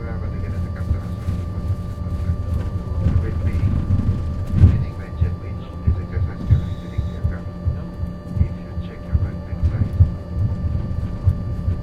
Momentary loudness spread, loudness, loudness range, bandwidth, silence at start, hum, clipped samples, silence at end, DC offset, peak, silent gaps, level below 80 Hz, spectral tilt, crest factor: 8 LU; -23 LUFS; 4 LU; 5.4 kHz; 0 s; none; under 0.1%; 0 s; under 0.1%; -2 dBFS; none; -28 dBFS; -9.5 dB/octave; 20 dB